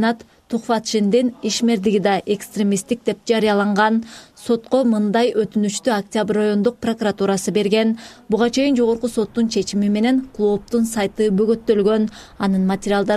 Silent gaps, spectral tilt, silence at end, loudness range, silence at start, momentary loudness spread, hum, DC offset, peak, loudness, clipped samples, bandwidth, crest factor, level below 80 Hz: none; -5 dB/octave; 0 s; 1 LU; 0 s; 6 LU; none; under 0.1%; -4 dBFS; -19 LUFS; under 0.1%; 14 kHz; 14 dB; -52 dBFS